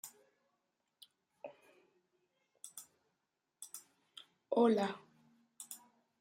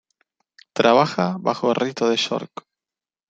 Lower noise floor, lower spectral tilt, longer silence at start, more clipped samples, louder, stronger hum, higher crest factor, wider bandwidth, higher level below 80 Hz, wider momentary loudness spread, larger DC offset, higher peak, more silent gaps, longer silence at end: about the same, -87 dBFS vs under -90 dBFS; about the same, -4.5 dB/octave vs -5 dB/octave; second, 0.05 s vs 0.75 s; neither; second, -35 LUFS vs -20 LUFS; neither; about the same, 24 dB vs 20 dB; first, 16 kHz vs 9 kHz; second, under -90 dBFS vs -66 dBFS; first, 25 LU vs 15 LU; neither; second, -20 dBFS vs -2 dBFS; neither; second, 0.45 s vs 0.85 s